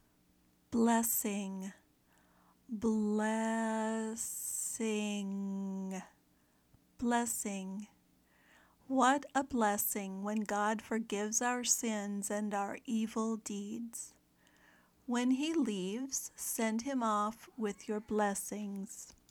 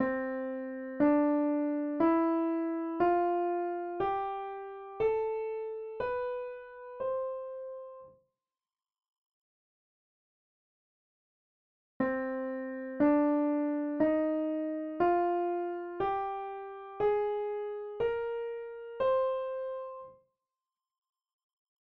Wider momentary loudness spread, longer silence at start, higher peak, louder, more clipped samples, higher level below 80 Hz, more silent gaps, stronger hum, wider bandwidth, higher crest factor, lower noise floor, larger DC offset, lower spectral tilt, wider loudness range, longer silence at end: about the same, 12 LU vs 14 LU; first, 0.7 s vs 0 s; about the same, -16 dBFS vs -16 dBFS; second, -35 LUFS vs -32 LUFS; neither; second, -72 dBFS vs -66 dBFS; second, none vs 9.18-12.00 s; neither; first, 19.5 kHz vs 4.7 kHz; about the same, 20 dB vs 18 dB; second, -71 dBFS vs under -90 dBFS; neither; second, -3.5 dB/octave vs -5.5 dB/octave; second, 5 LU vs 11 LU; second, 0.2 s vs 1.85 s